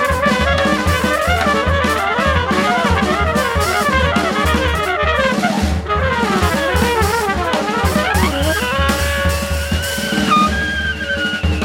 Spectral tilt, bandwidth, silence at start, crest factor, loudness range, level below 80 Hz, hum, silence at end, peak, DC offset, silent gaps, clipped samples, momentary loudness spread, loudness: -4.5 dB/octave; 17 kHz; 0 s; 14 dB; 1 LU; -26 dBFS; none; 0 s; -2 dBFS; under 0.1%; none; under 0.1%; 4 LU; -16 LUFS